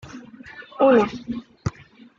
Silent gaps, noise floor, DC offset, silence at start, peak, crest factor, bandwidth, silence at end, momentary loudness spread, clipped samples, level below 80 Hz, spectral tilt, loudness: none; -44 dBFS; under 0.1%; 0.05 s; -6 dBFS; 18 dB; 7.4 kHz; 0.5 s; 24 LU; under 0.1%; -50 dBFS; -7 dB/octave; -21 LUFS